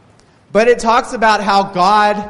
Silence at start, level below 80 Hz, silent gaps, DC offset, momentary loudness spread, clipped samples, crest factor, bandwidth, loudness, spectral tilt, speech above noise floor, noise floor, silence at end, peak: 0.55 s; -42 dBFS; none; under 0.1%; 3 LU; under 0.1%; 12 dB; 11.5 kHz; -13 LUFS; -4 dB/octave; 36 dB; -48 dBFS; 0 s; 0 dBFS